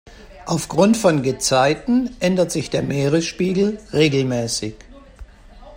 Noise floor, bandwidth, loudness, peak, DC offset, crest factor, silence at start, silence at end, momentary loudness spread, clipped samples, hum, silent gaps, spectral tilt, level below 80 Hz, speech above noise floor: -42 dBFS; 16 kHz; -19 LUFS; -2 dBFS; under 0.1%; 18 dB; 0.05 s; 0 s; 8 LU; under 0.1%; none; none; -5 dB/octave; -46 dBFS; 24 dB